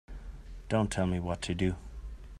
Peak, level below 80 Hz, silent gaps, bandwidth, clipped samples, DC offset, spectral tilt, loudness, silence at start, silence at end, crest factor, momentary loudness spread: -14 dBFS; -44 dBFS; none; 13 kHz; under 0.1%; under 0.1%; -6 dB/octave; -32 LUFS; 0.1 s; 0 s; 20 dB; 18 LU